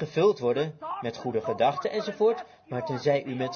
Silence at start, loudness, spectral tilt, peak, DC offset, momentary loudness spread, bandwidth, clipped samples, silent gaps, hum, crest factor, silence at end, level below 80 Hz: 0 s; -28 LUFS; -6.5 dB/octave; -12 dBFS; under 0.1%; 10 LU; 6.8 kHz; under 0.1%; none; none; 16 dB; 0 s; -72 dBFS